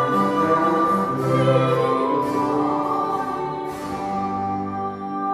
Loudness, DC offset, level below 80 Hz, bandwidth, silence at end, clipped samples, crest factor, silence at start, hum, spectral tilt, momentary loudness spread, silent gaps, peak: -21 LUFS; under 0.1%; -56 dBFS; 15 kHz; 0 s; under 0.1%; 14 dB; 0 s; none; -7.5 dB/octave; 9 LU; none; -6 dBFS